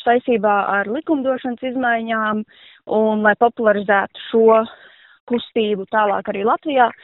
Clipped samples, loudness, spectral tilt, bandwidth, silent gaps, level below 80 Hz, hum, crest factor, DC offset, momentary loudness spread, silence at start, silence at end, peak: under 0.1%; -18 LUFS; -3 dB/octave; 4.1 kHz; 5.20-5.27 s; -62 dBFS; none; 16 dB; under 0.1%; 8 LU; 0 s; 0.1 s; -2 dBFS